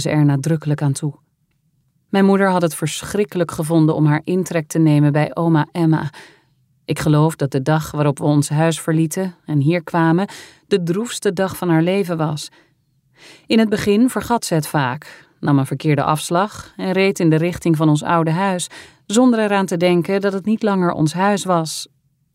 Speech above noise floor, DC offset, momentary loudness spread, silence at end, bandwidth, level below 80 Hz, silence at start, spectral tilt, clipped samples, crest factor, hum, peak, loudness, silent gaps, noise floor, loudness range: 47 dB; under 0.1%; 8 LU; 0.5 s; 16 kHz; -54 dBFS; 0 s; -6 dB/octave; under 0.1%; 14 dB; none; -2 dBFS; -18 LUFS; none; -64 dBFS; 3 LU